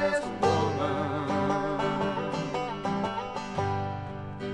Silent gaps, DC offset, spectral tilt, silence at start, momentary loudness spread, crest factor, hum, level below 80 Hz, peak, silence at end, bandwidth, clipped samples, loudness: none; under 0.1%; -6 dB/octave; 0 s; 7 LU; 18 dB; none; -54 dBFS; -12 dBFS; 0 s; 11.5 kHz; under 0.1%; -30 LUFS